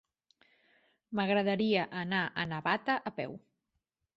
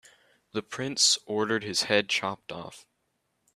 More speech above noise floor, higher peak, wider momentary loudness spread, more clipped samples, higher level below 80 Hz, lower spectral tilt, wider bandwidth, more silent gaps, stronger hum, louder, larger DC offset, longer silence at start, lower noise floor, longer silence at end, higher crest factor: first, 52 dB vs 48 dB; second, -14 dBFS vs -6 dBFS; second, 11 LU vs 18 LU; neither; about the same, -72 dBFS vs -72 dBFS; first, -7.5 dB/octave vs -1.5 dB/octave; second, 7.4 kHz vs 14.5 kHz; neither; neither; second, -32 LUFS vs -26 LUFS; neither; first, 1.1 s vs 0.55 s; first, -84 dBFS vs -77 dBFS; about the same, 0.8 s vs 0.75 s; about the same, 20 dB vs 24 dB